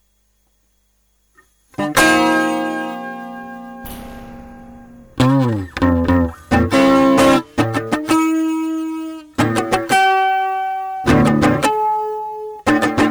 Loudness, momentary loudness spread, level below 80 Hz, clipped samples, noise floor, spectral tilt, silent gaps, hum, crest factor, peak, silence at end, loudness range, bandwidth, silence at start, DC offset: -16 LUFS; 20 LU; -38 dBFS; under 0.1%; -61 dBFS; -5.5 dB/octave; none; 50 Hz at -50 dBFS; 14 dB; -2 dBFS; 0 s; 6 LU; over 20 kHz; 1.8 s; under 0.1%